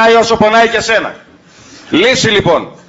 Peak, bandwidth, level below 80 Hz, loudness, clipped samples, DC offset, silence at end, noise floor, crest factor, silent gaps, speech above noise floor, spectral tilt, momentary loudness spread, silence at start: 0 dBFS; 8 kHz; -42 dBFS; -10 LUFS; under 0.1%; under 0.1%; 0.2 s; -39 dBFS; 10 dB; none; 29 dB; -3.5 dB/octave; 6 LU; 0 s